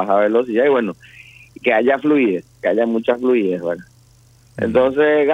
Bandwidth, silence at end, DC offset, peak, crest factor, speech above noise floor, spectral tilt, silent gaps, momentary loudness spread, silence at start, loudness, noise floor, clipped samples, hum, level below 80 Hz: 8.8 kHz; 0 s; under 0.1%; -2 dBFS; 16 dB; 34 dB; -7 dB/octave; none; 11 LU; 0 s; -17 LUFS; -50 dBFS; under 0.1%; none; -56 dBFS